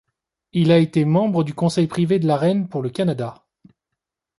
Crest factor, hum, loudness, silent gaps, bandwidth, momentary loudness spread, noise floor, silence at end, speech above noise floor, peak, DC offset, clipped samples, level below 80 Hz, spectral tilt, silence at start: 16 dB; none; -19 LUFS; none; 11.5 kHz; 9 LU; -82 dBFS; 1.05 s; 64 dB; -4 dBFS; under 0.1%; under 0.1%; -60 dBFS; -7.5 dB/octave; 0.55 s